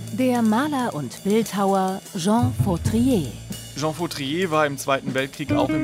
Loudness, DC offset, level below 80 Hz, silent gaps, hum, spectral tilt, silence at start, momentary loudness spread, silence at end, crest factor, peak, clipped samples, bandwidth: -22 LUFS; under 0.1%; -44 dBFS; none; none; -5.5 dB/octave; 0 s; 7 LU; 0 s; 16 dB; -6 dBFS; under 0.1%; 16 kHz